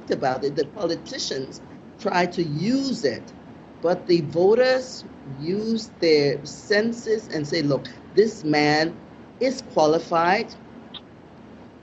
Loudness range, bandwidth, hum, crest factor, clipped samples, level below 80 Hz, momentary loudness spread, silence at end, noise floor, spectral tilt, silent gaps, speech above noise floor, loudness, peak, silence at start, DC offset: 4 LU; 8.2 kHz; none; 18 dB; under 0.1%; -58 dBFS; 18 LU; 0.15 s; -45 dBFS; -5 dB/octave; none; 23 dB; -23 LUFS; -6 dBFS; 0 s; under 0.1%